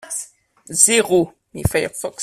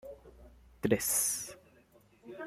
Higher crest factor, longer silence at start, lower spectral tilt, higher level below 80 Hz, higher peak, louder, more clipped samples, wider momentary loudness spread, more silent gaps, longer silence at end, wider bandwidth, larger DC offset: about the same, 20 dB vs 24 dB; about the same, 0.05 s vs 0.05 s; about the same, -3 dB/octave vs -3 dB/octave; first, -42 dBFS vs -62 dBFS; first, 0 dBFS vs -12 dBFS; first, -17 LUFS vs -31 LUFS; neither; second, 15 LU vs 23 LU; neither; about the same, 0 s vs 0 s; about the same, 16 kHz vs 16 kHz; neither